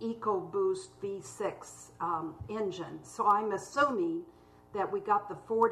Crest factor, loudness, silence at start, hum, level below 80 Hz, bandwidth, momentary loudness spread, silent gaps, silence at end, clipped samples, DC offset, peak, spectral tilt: 18 dB; -33 LUFS; 0 s; 60 Hz at -65 dBFS; -68 dBFS; 13 kHz; 12 LU; none; 0 s; under 0.1%; under 0.1%; -14 dBFS; -5 dB/octave